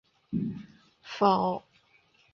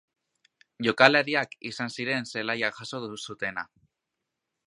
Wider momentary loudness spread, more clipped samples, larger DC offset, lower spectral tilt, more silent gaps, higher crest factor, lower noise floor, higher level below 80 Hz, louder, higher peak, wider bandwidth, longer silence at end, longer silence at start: about the same, 17 LU vs 17 LU; neither; neither; first, -7.5 dB/octave vs -4 dB/octave; neither; second, 22 dB vs 28 dB; second, -65 dBFS vs -84 dBFS; first, -64 dBFS vs -72 dBFS; second, -29 LUFS vs -26 LUFS; second, -10 dBFS vs 0 dBFS; second, 7 kHz vs 11.5 kHz; second, 0.75 s vs 1 s; second, 0.3 s vs 0.8 s